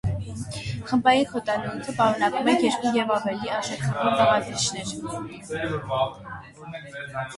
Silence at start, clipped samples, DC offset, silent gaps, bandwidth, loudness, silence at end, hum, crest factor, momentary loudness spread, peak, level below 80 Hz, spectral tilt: 0.05 s; under 0.1%; under 0.1%; none; 11.5 kHz; -25 LUFS; 0 s; none; 20 dB; 14 LU; -6 dBFS; -50 dBFS; -4.5 dB/octave